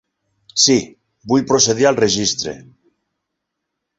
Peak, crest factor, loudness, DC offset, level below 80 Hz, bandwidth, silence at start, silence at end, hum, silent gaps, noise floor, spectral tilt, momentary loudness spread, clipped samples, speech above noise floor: 0 dBFS; 18 dB; -15 LUFS; under 0.1%; -54 dBFS; 8 kHz; 0.55 s; 1.4 s; none; none; -78 dBFS; -3 dB/octave; 14 LU; under 0.1%; 62 dB